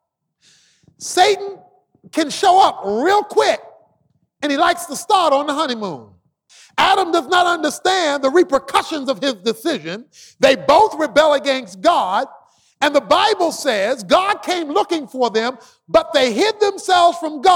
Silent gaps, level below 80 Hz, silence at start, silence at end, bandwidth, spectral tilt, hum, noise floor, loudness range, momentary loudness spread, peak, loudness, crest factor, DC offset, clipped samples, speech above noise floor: none; -56 dBFS; 1 s; 0 s; 18 kHz; -2.5 dB/octave; none; -63 dBFS; 2 LU; 9 LU; -2 dBFS; -16 LUFS; 14 dB; under 0.1%; under 0.1%; 47 dB